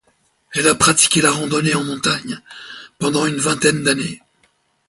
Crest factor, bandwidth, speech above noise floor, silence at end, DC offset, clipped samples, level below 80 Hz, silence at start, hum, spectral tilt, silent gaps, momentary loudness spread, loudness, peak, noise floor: 18 dB; 12 kHz; 44 dB; 0.7 s; under 0.1%; under 0.1%; -52 dBFS; 0.5 s; none; -3 dB/octave; none; 19 LU; -16 LUFS; 0 dBFS; -61 dBFS